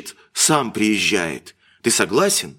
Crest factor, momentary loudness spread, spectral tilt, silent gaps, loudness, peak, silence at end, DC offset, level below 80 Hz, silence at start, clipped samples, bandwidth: 20 dB; 11 LU; -2.5 dB/octave; none; -18 LUFS; 0 dBFS; 0.05 s; under 0.1%; -60 dBFS; 0 s; under 0.1%; 17 kHz